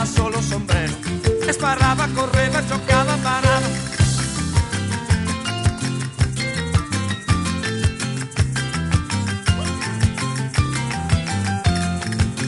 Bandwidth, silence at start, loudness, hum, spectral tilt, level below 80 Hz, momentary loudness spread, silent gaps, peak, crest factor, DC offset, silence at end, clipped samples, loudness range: 11.5 kHz; 0 s; -21 LUFS; none; -5 dB/octave; -32 dBFS; 6 LU; none; -2 dBFS; 18 dB; under 0.1%; 0 s; under 0.1%; 3 LU